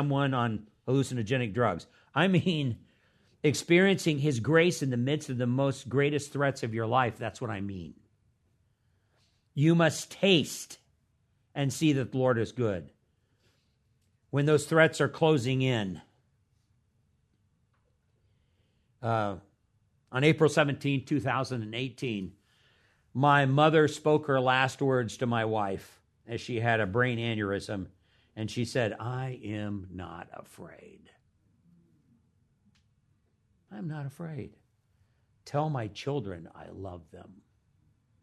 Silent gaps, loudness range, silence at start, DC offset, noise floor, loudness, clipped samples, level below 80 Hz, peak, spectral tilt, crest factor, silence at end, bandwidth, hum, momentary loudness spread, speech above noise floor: none; 12 LU; 0 s; under 0.1%; -72 dBFS; -28 LUFS; under 0.1%; -68 dBFS; -8 dBFS; -6 dB/octave; 22 dB; 0.9 s; 13.5 kHz; none; 18 LU; 43 dB